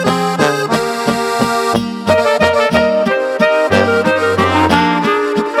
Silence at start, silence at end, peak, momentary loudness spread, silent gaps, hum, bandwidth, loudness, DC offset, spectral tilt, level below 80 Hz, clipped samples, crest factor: 0 s; 0 s; 0 dBFS; 4 LU; none; none; 16 kHz; -13 LUFS; under 0.1%; -5 dB/octave; -42 dBFS; under 0.1%; 12 dB